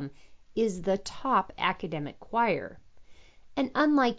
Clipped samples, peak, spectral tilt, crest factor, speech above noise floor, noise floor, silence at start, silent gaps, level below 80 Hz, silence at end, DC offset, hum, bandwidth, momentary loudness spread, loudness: under 0.1%; -12 dBFS; -5.5 dB/octave; 18 dB; 22 dB; -50 dBFS; 0 s; none; -58 dBFS; 0 s; under 0.1%; none; 7.8 kHz; 12 LU; -29 LUFS